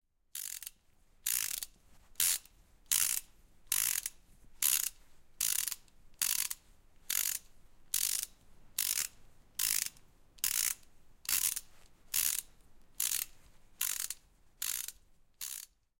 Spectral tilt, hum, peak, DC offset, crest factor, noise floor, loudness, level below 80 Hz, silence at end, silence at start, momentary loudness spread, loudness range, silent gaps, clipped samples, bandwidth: 3 dB/octave; none; -10 dBFS; under 0.1%; 28 dB; -65 dBFS; -34 LUFS; -64 dBFS; 0.35 s; 0.35 s; 13 LU; 3 LU; none; under 0.1%; 17 kHz